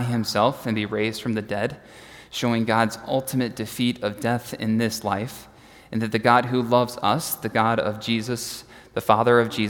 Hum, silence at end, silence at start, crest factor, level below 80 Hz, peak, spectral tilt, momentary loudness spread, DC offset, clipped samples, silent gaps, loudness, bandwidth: none; 0 s; 0 s; 22 dB; -58 dBFS; 0 dBFS; -5 dB/octave; 13 LU; under 0.1%; under 0.1%; none; -23 LUFS; 18 kHz